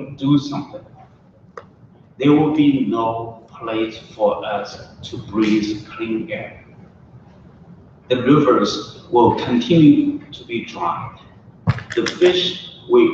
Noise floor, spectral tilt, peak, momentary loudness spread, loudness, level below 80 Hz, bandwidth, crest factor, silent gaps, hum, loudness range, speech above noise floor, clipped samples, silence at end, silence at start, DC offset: -49 dBFS; -6.5 dB/octave; -2 dBFS; 18 LU; -18 LUFS; -52 dBFS; 7.6 kHz; 18 dB; none; none; 7 LU; 31 dB; under 0.1%; 0 s; 0 s; under 0.1%